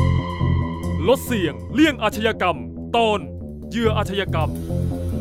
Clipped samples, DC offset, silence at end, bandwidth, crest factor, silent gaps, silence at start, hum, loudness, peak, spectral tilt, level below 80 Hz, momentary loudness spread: under 0.1%; under 0.1%; 0 s; 16 kHz; 16 dB; none; 0 s; none; -21 LUFS; -4 dBFS; -6 dB/octave; -34 dBFS; 7 LU